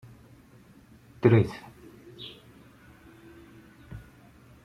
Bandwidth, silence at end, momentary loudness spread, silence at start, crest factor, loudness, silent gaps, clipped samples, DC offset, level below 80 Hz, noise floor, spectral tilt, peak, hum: 10 kHz; 0.65 s; 29 LU; 1.25 s; 26 dB; -24 LUFS; none; under 0.1%; under 0.1%; -58 dBFS; -55 dBFS; -8.5 dB/octave; -6 dBFS; none